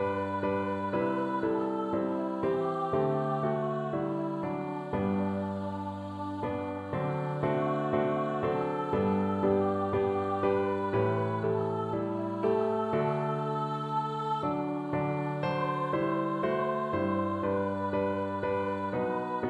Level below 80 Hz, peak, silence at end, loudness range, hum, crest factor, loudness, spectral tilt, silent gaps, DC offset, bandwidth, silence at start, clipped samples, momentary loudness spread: -62 dBFS; -16 dBFS; 0 s; 3 LU; none; 16 dB; -31 LUFS; -9 dB/octave; none; under 0.1%; 10 kHz; 0 s; under 0.1%; 5 LU